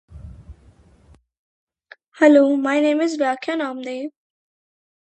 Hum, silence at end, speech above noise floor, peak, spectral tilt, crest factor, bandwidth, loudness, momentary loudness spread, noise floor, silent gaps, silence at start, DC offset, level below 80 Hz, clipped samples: none; 0.95 s; 36 dB; 0 dBFS; -5 dB/octave; 22 dB; 8.8 kHz; -18 LUFS; 16 LU; -53 dBFS; 1.39-1.67 s, 2.08-2.12 s; 0.1 s; under 0.1%; -50 dBFS; under 0.1%